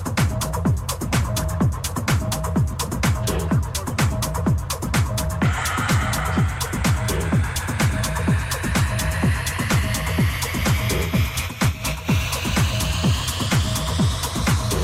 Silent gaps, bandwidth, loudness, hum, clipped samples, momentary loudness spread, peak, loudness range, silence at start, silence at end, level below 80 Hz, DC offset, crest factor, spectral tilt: none; 16.5 kHz; -22 LUFS; none; under 0.1%; 2 LU; -8 dBFS; 1 LU; 0 s; 0 s; -30 dBFS; under 0.1%; 12 dB; -4.5 dB/octave